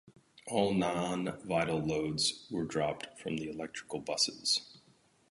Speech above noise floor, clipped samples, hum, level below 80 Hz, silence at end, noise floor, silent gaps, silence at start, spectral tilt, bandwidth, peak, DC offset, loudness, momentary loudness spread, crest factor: 33 dB; under 0.1%; none; -64 dBFS; 0.55 s; -67 dBFS; none; 0.05 s; -4 dB/octave; 11.5 kHz; -14 dBFS; under 0.1%; -33 LUFS; 10 LU; 22 dB